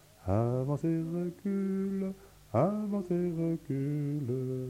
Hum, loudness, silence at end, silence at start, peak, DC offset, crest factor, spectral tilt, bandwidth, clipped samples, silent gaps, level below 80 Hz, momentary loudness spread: none; -33 LUFS; 0 s; 0.2 s; -14 dBFS; under 0.1%; 18 dB; -9.5 dB/octave; 16 kHz; under 0.1%; none; -60 dBFS; 5 LU